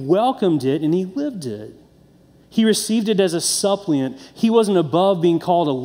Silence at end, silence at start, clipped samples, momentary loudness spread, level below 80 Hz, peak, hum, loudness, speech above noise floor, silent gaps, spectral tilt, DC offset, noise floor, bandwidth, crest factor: 0 s; 0 s; under 0.1%; 9 LU; -62 dBFS; -2 dBFS; none; -19 LUFS; 33 dB; none; -5 dB/octave; under 0.1%; -51 dBFS; 16 kHz; 16 dB